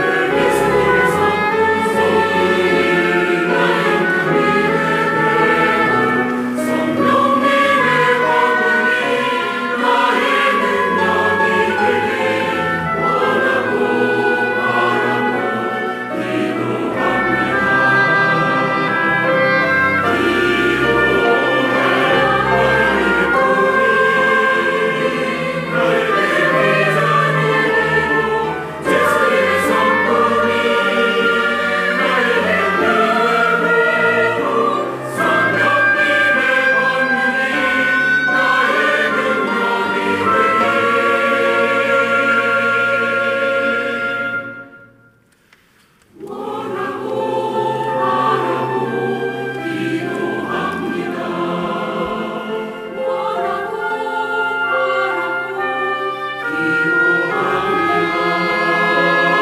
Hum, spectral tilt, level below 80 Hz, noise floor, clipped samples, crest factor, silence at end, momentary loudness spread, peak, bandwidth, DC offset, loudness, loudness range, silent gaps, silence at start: none; -5 dB/octave; -50 dBFS; -53 dBFS; under 0.1%; 12 dB; 0 s; 7 LU; -4 dBFS; 16 kHz; under 0.1%; -15 LUFS; 7 LU; none; 0 s